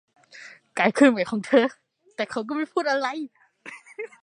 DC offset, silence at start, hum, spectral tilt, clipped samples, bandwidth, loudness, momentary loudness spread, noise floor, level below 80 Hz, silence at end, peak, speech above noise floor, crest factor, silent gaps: under 0.1%; 0.35 s; none; -5 dB/octave; under 0.1%; 11 kHz; -23 LUFS; 24 LU; -47 dBFS; -74 dBFS; 0.15 s; -4 dBFS; 25 dB; 22 dB; none